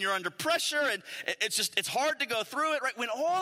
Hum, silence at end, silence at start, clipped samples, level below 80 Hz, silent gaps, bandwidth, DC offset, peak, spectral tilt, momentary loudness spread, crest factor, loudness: none; 0 s; 0 s; under 0.1%; -82 dBFS; none; 16 kHz; under 0.1%; -10 dBFS; -1 dB/octave; 4 LU; 20 dB; -30 LUFS